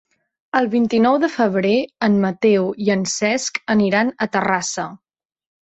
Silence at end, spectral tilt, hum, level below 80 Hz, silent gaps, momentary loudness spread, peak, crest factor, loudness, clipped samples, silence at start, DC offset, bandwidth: 0.8 s; -4.5 dB/octave; none; -60 dBFS; none; 5 LU; -4 dBFS; 16 dB; -18 LUFS; under 0.1%; 0.55 s; under 0.1%; 8.2 kHz